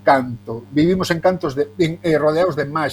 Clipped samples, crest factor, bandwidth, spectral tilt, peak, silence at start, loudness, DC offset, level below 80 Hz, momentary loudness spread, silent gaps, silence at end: under 0.1%; 18 dB; 19 kHz; -6.5 dB/octave; 0 dBFS; 0.05 s; -18 LUFS; under 0.1%; -48 dBFS; 6 LU; none; 0 s